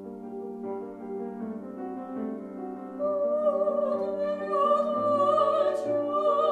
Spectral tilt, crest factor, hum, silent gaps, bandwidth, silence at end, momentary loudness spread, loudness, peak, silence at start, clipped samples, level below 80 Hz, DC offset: -7 dB/octave; 16 dB; none; none; 9.4 kHz; 0 s; 14 LU; -28 LUFS; -12 dBFS; 0 s; under 0.1%; -76 dBFS; under 0.1%